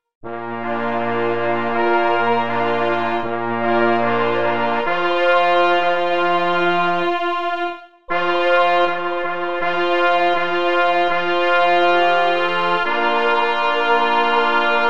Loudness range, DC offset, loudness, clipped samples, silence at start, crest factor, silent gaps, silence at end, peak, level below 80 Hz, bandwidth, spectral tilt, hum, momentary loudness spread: 3 LU; 4%; -18 LUFS; under 0.1%; 0 s; 14 dB; 0.15-0.21 s; 0 s; -4 dBFS; -56 dBFS; 8.2 kHz; -5.5 dB/octave; none; 7 LU